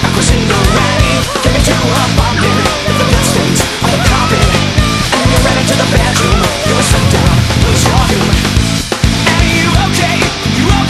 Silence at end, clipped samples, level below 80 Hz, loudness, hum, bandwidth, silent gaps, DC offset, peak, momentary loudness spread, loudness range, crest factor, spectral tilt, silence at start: 0 s; 0.1%; -18 dBFS; -10 LUFS; none; 14 kHz; none; under 0.1%; 0 dBFS; 2 LU; 1 LU; 10 dB; -4.5 dB/octave; 0 s